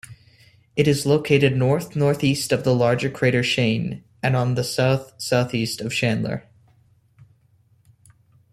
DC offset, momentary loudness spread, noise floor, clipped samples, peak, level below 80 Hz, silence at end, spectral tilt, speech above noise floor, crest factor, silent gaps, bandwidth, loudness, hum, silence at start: under 0.1%; 8 LU; -59 dBFS; under 0.1%; -2 dBFS; -54 dBFS; 2.15 s; -5.5 dB/octave; 39 dB; 20 dB; none; 14.5 kHz; -21 LUFS; none; 0.1 s